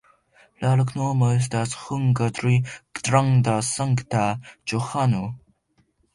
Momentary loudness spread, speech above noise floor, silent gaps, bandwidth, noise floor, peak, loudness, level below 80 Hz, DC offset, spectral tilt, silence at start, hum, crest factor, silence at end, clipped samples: 9 LU; 44 dB; none; 11.5 kHz; -66 dBFS; -6 dBFS; -23 LUFS; -54 dBFS; under 0.1%; -6 dB/octave; 0.6 s; none; 18 dB; 0.75 s; under 0.1%